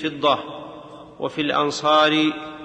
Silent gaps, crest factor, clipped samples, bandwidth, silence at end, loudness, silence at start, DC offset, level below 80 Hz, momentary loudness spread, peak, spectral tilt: none; 16 dB; under 0.1%; 9 kHz; 0 s; -20 LUFS; 0 s; under 0.1%; -60 dBFS; 20 LU; -6 dBFS; -4 dB/octave